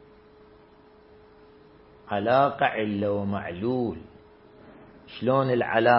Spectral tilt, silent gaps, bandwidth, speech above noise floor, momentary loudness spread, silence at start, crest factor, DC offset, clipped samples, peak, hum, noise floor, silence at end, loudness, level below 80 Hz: -10.5 dB/octave; none; 5.8 kHz; 30 dB; 10 LU; 2.1 s; 22 dB; under 0.1%; under 0.1%; -6 dBFS; none; -54 dBFS; 0 s; -25 LUFS; -62 dBFS